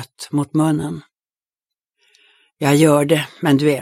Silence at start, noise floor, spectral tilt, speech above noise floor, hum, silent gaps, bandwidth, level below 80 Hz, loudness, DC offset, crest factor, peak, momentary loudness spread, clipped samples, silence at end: 0 s; under -90 dBFS; -6 dB/octave; over 74 dB; none; none; 16 kHz; -60 dBFS; -17 LUFS; under 0.1%; 16 dB; -2 dBFS; 11 LU; under 0.1%; 0 s